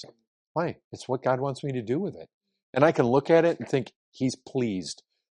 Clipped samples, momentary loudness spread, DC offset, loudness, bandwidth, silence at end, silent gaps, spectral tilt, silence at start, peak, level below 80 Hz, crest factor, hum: under 0.1%; 16 LU; under 0.1%; -27 LUFS; 11 kHz; 0.4 s; 0.27-0.55 s, 0.84-0.91 s, 2.34-2.41 s, 2.63-2.73 s, 3.96-4.12 s; -6.5 dB/octave; 0 s; -4 dBFS; -68 dBFS; 22 dB; none